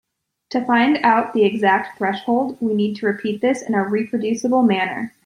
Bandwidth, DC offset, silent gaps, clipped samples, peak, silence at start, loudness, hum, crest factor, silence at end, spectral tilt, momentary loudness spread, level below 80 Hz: 11 kHz; under 0.1%; none; under 0.1%; -2 dBFS; 0.5 s; -19 LUFS; none; 16 dB; 0.15 s; -5.5 dB/octave; 7 LU; -66 dBFS